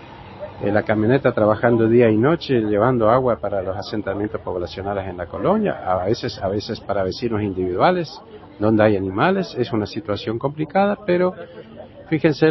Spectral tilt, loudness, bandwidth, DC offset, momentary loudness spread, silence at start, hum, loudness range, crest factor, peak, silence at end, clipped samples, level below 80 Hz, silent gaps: -8 dB/octave; -20 LUFS; 6 kHz; under 0.1%; 11 LU; 0 s; none; 6 LU; 18 dB; -2 dBFS; 0 s; under 0.1%; -46 dBFS; none